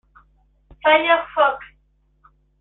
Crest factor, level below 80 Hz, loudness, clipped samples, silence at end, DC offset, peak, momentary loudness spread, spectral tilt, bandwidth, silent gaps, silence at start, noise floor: 20 dB; -56 dBFS; -18 LUFS; under 0.1%; 0.95 s; under 0.1%; -2 dBFS; 7 LU; -7 dB/octave; 4.1 kHz; none; 0.85 s; -61 dBFS